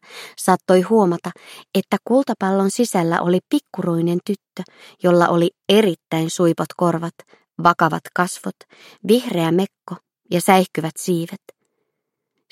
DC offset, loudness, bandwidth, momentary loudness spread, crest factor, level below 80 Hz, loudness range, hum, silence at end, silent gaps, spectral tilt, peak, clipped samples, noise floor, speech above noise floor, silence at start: under 0.1%; -19 LUFS; 16 kHz; 17 LU; 20 dB; -66 dBFS; 2 LU; none; 1.15 s; none; -5.5 dB/octave; 0 dBFS; under 0.1%; -78 dBFS; 59 dB; 0.1 s